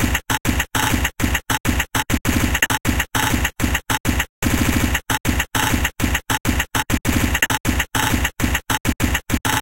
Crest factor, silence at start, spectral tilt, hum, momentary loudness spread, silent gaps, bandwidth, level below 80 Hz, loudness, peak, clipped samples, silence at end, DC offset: 18 dB; 0 s; -3.5 dB/octave; none; 3 LU; 1.60-1.64 s, 4.00-4.04 s, 4.29-4.42 s, 5.20-5.24 s, 7.60-7.64 s, 8.80-8.84 s; 17.5 kHz; -28 dBFS; -19 LUFS; -2 dBFS; under 0.1%; 0 s; 0.3%